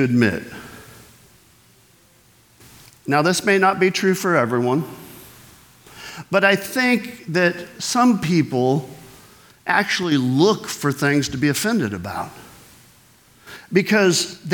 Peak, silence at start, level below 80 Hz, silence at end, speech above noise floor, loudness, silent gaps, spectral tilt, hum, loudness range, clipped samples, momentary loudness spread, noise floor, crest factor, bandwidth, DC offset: -2 dBFS; 0 s; -58 dBFS; 0 s; 35 dB; -19 LUFS; none; -4.5 dB/octave; none; 4 LU; under 0.1%; 19 LU; -54 dBFS; 20 dB; 19.5 kHz; under 0.1%